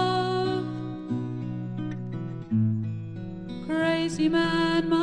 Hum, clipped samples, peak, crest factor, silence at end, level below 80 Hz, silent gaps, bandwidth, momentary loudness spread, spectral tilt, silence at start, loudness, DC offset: none; under 0.1%; -12 dBFS; 16 dB; 0 s; -52 dBFS; none; 11 kHz; 12 LU; -6.5 dB/octave; 0 s; -28 LUFS; under 0.1%